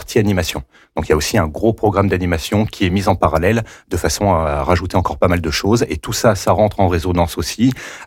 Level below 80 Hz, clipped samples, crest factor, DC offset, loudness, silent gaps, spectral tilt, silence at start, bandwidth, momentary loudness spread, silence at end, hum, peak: -34 dBFS; under 0.1%; 14 dB; under 0.1%; -17 LUFS; none; -5.5 dB/octave; 0 s; 17 kHz; 5 LU; 0 s; none; -2 dBFS